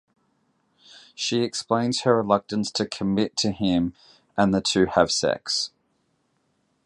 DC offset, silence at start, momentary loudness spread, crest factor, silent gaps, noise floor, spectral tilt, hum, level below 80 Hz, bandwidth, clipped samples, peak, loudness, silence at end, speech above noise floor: under 0.1%; 0.95 s; 7 LU; 22 dB; none; -70 dBFS; -4.5 dB/octave; none; -54 dBFS; 11.5 kHz; under 0.1%; -4 dBFS; -23 LUFS; 1.2 s; 47 dB